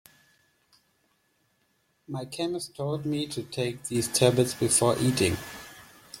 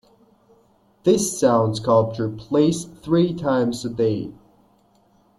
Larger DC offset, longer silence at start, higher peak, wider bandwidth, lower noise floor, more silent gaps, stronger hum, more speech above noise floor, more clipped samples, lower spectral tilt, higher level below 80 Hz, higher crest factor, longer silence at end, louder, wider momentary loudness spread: neither; first, 2.1 s vs 1.05 s; about the same, -6 dBFS vs -4 dBFS; first, 16.5 kHz vs 13 kHz; first, -71 dBFS vs -59 dBFS; neither; neither; first, 44 dB vs 39 dB; neither; second, -4 dB/octave vs -6 dB/octave; about the same, -60 dBFS vs -56 dBFS; first, 24 dB vs 18 dB; second, 0 s vs 1.05 s; second, -27 LUFS vs -21 LUFS; first, 17 LU vs 8 LU